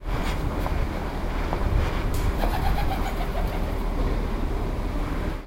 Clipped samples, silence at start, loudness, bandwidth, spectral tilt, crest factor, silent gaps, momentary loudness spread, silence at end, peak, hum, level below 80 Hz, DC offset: under 0.1%; 0 s; -28 LUFS; 16 kHz; -6.5 dB/octave; 14 dB; none; 4 LU; 0 s; -10 dBFS; none; -26 dBFS; under 0.1%